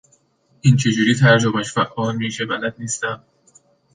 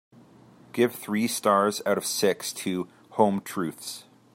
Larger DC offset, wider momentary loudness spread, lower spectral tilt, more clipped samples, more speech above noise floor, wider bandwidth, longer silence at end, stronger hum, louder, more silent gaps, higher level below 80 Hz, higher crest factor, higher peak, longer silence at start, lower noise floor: neither; about the same, 11 LU vs 13 LU; about the same, -5 dB/octave vs -4 dB/octave; neither; first, 41 dB vs 27 dB; second, 9.8 kHz vs 16 kHz; first, 0.75 s vs 0.35 s; neither; first, -18 LUFS vs -26 LUFS; neither; first, -56 dBFS vs -76 dBFS; about the same, 18 dB vs 22 dB; first, -2 dBFS vs -6 dBFS; about the same, 0.65 s vs 0.75 s; first, -59 dBFS vs -53 dBFS